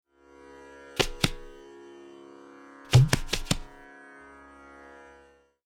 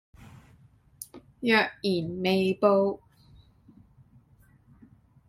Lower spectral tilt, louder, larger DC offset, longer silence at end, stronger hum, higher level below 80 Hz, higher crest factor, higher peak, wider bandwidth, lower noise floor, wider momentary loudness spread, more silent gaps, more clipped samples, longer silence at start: about the same, -4.5 dB/octave vs -5.5 dB/octave; about the same, -26 LUFS vs -25 LUFS; neither; second, 2.05 s vs 2.35 s; neither; first, -42 dBFS vs -64 dBFS; about the same, 24 dB vs 22 dB; about the same, -6 dBFS vs -8 dBFS; about the same, 16.5 kHz vs 15.5 kHz; about the same, -58 dBFS vs -60 dBFS; first, 27 LU vs 21 LU; neither; neither; about the same, 0.95 s vs 1 s